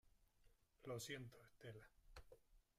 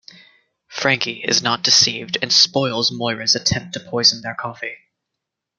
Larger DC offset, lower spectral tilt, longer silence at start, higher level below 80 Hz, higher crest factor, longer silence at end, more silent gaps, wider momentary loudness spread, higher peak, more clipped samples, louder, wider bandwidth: neither; first, -4 dB/octave vs -2 dB/octave; second, 0.05 s vs 0.7 s; second, -74 dBFS vs -56 dBFS; about the same, 20 dB vs 20 dB; second, 0.15 s vs 0.85 s; neither; about the same, 15 LU vs 14 LU; second, -38 dBFS vs 0 dBFS; neither; second, -57 LUFS vs -16 LUFS; first, 15.5 kHz vs 12 kHz